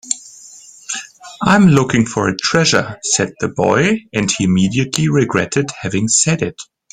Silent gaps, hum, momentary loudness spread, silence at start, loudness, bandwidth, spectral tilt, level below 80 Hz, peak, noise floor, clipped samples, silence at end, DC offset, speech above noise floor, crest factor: none; none; 14 LU; 0.05 s; -15 LUFS; 14 kHz; -4 dB/octave; -48 dBFS; 0 dBFS; -40 dBFS; under 0.1%; 0.3 s; under 0.1%; 25 dB; 16 dB